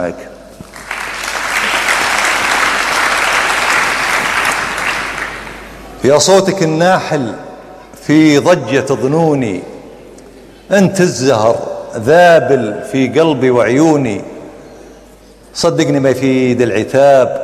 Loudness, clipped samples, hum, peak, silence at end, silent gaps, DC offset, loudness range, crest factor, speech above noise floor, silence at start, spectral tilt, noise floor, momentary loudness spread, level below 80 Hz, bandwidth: -12 LUFS; under 0.1%; none; 0 dBFS; 0 s; none; under 0.1%; 3 LU; 12 dB; 29 dB; 0 s; -4.5 dB/octave; -40 dBFS; 16 LU; -44 dBFS; 15.5 kHz